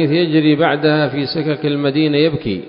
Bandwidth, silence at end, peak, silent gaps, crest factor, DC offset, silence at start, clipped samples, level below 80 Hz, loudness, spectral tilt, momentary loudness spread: 5.4 kHz; 0 s; 0 dBFS; none; 14 dB; under 0.1%; 0 s; under 0.1%; -48 dBFS; -15 LUFS; -12 dB/octave; 5 LU